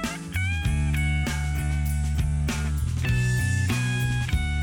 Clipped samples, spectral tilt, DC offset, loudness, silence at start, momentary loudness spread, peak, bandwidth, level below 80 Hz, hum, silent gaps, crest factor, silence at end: under 0.1%; -5 dB/octave; under 0.1%; -26 LUFS; 0 s; 3 LU; -12 dBFS; 18 kHz; -28 dBFS; none; none; 12 dB; 0 s